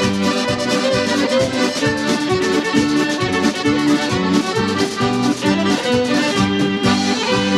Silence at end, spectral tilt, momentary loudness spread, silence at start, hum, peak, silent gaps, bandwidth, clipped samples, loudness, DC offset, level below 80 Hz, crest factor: 0 s; -4.5 dB/octave; 2 LU; 0 s; none; -4 dBFS; none; 14 kHz; under 0.1%; -17 LUFS; under 0.1%; -46 dBFS; 14 dB